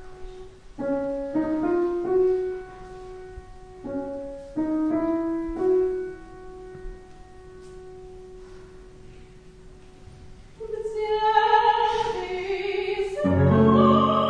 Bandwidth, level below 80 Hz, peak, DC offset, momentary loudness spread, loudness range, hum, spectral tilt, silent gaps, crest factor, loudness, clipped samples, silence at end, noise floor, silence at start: 10 kHz; -48 dBFS; -6 dBFS; 0.1%; 25 LU; 22 LU; none; -7.5 dB/octave; none; 18 dB; -24 LUFS; under 0.1%; 0 s; -46 dBFS; 0 s